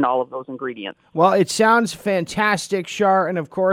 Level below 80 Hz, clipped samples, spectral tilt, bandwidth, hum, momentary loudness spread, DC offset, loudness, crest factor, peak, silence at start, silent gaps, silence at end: -60 dBFS; under 0.1%; -4.5 dB/octave; 16.5 kHz; none; 13 LU; under 0.1%; -19 LUFS; 16 dB; -2 dBFS; 0 s; none; 0 s